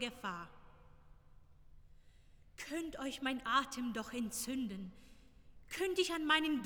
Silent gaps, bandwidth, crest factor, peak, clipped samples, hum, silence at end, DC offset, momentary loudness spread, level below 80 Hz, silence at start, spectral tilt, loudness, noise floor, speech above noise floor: none; over 20 kHz; 24 dB; -18 dBFS; under 0.1%; none; 0 s; under 0.1%; 17 LU; -64 dBFS; 0 s; -3 dB/octave; -38 LUFS; -62 dBFS; 23 dB